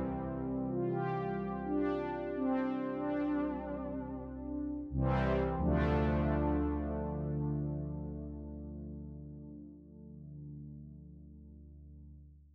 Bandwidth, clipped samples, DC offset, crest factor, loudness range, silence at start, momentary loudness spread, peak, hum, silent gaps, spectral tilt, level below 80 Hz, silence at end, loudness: 5.6 kHz; under 0.1%; under 0.1%; 16 dB; 15 LU; 0 s; 21 LU; -20 dBFS; none; none; -10.5 dB/octave; -46 dBFS; 0.05 s; -36 LUFS